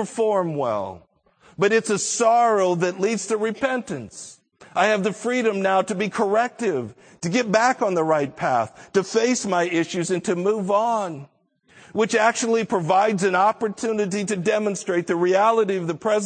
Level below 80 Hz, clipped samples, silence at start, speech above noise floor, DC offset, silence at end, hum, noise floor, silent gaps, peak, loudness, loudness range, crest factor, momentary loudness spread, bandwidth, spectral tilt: -68 dBFS; under 0.1%; 0 s; 35 dB; under 0.1%; 0 s; none; -56 dBFS; none; -4 dBFS; -21 LUFS; 2 LU; 18 dB; 8 LU; 9.4 kHz; -4.5 dB/octave